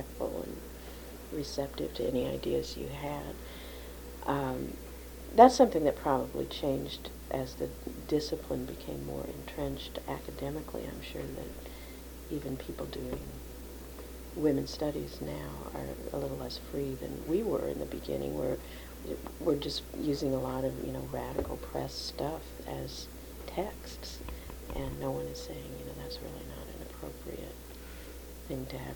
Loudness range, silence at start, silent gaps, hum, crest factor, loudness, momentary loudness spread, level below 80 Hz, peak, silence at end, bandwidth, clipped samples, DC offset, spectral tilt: 13 LU; 0 s; none; none; 28 dB; -35 LUFS; 14 LU; -48 dBFS; -6 dBFS; 0 s; 19 kHz; under 0.1%; under 0.1%; -5.5 dB/octave